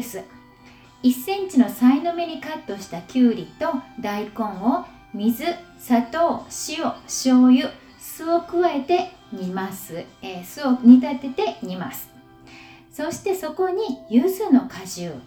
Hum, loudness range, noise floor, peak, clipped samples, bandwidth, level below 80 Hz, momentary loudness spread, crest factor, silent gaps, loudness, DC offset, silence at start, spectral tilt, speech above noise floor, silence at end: none; 4 LU; -48 dBFS; -2 dBFS; under 0.1%; 19.5 kHz; -60 dBFS; 17 LU; 20 dB; none; -21 LUFS; under 0.1%; 0 s; -5 dB/octave; 28 dB; 0.05 s